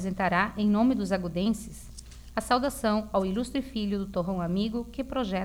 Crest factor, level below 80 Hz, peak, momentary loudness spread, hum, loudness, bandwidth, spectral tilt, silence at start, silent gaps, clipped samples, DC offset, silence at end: 18 dB; -46 dBFS; -10 dBFS; 10 LU; none; -28 LUFS; 16.5 kHz; -6 dB/octave; 0 s; none; under 0.1%; under 0.1%; 0 s